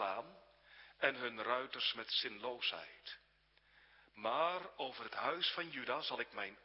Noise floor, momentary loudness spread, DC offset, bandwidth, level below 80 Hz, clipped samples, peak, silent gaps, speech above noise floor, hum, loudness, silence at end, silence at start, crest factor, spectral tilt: -73 dBFS; 15 LU; under 0.1%; 5.6 kHz; -82 dBFS; under 0.1%; -16 dBFS; none; 32 dB; none; -40 LUFS; 0.05 s; 0 s; 26 dB; 1 dB/octave